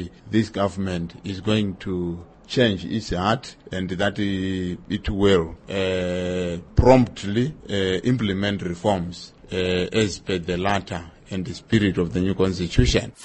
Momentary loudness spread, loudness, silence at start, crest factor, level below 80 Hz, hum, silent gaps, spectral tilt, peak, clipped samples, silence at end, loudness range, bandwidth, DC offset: 11 LU; -23 LUFS; 0 s; 20 dB; -38 dBFS; none; none; -6 dB/octave; -2 dBFS; under 0.1%; 0 s; 3 LU; 8.8 kHz; under 0.1%